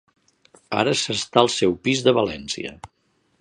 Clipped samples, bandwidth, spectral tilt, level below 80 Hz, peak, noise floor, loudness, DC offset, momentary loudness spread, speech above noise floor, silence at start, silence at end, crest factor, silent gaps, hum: under 0.1%; 11 kHz; -4 dB/octave; -54 dBFS; 0 dBFS; -56 dBFS; -21 LUFS; under 0.1%; 11 LU; 35 dB; 0.7 s; 0.55 s; 22 dB; none; none